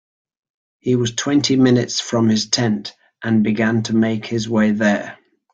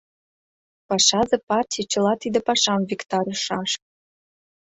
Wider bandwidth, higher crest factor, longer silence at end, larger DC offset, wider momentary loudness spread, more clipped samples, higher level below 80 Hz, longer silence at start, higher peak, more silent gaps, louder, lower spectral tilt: about the same, 9 kHz vs 8.4 kHz; about the same, 16 dB vs 20 dB; second, 0.4 s vs 0.9 s; neither; about the same, 10 LU vs 8 LU; neither; first, -56 dBFS vs -62 dBFS; about the same, 0.85 s vs 0.9 s; about the same, -2 dBFS vs -4 dBFS; second, none vs 1.43-1.47 s; first, -18 LUFS vs -21 LUFS; first, -5 dB/octave vs -2.5 dB/octave